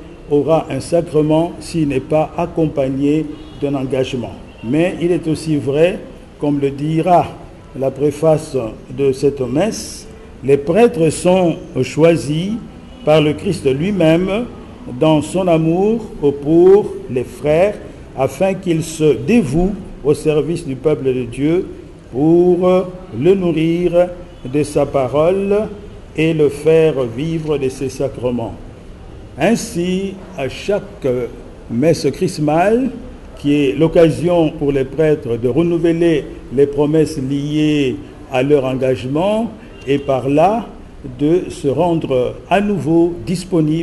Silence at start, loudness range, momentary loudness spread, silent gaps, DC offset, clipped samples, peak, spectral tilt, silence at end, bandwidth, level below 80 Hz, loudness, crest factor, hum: 0 s; 4 LU; 12 LU; none; under 0.1%; under 0.1%; -2 dBFS; -7 dB/octave; 0 s; 12.5 kHz; -38 dBFS; -16 LUFS; 14 dB; none